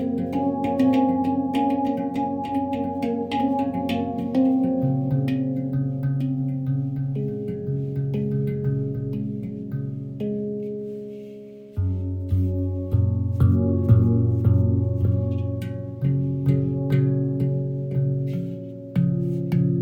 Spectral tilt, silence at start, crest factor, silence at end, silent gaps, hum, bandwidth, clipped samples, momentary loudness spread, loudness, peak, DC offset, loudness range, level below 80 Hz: -10 dB/octave; 0 s; 18 dB; 0 s; none; none; 5.6 kHz; under 0.1%; 10 LU; -24 LUFS; -6 dBFS; under 0.1%; 7 LU; -46 dBFS